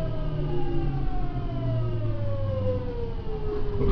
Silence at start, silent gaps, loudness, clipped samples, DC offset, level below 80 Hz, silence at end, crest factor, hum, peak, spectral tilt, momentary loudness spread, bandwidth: 0 s; none; -30 LUFS; under 0.1%; under 0.1%; -30 dBFS; 0 s; 14 dB; none; -12 dBFS; -10 dB/octave; 5 LU; 5.4 kHz